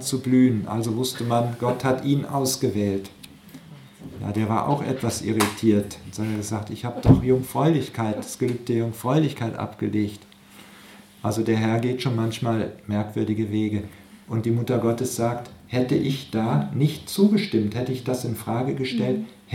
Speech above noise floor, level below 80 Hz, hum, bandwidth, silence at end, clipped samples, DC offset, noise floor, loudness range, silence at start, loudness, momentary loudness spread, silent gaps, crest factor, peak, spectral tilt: 25 dB; -48 dBFS; none; 16.5 kHz; 0 s; under 0.1%; under 0.1%; -48 dBFS; 4 LU; 0 s; -24 LUFS; 10 LU; none; 22 dB; -2 dBFS; -6 dB/octave